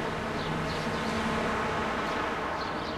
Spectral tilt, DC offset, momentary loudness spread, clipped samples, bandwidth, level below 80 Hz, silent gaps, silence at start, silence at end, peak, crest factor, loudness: -5 dB/octave; under 0.1%; 3 LU; under 0.1%; 15.5 kHz; -48 dBFS; none; 0 s; 0 s; -18 dBFS; 14 dB; -31 LUFS